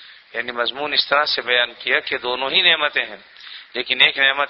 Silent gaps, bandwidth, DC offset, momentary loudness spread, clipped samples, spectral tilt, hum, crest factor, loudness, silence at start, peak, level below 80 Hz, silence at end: none; 6.2 kHz; under 0.1%; 16 LU; under 0.1%; -4 dB/octave; none; 20 dB; -17 LUFS; 0 s; 0 dBFS; -62 dBFS; 0 s